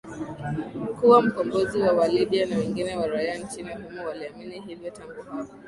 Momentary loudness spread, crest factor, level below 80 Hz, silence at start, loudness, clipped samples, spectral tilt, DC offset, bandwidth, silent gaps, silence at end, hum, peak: 20 LU; 20 dB; -56 dBFS; 0.05 s; -24 LUFS; under 0.1%; -6 dB/octave; under 0.1%; 11.5 kHz; none; 0 s; none; -4 dBFS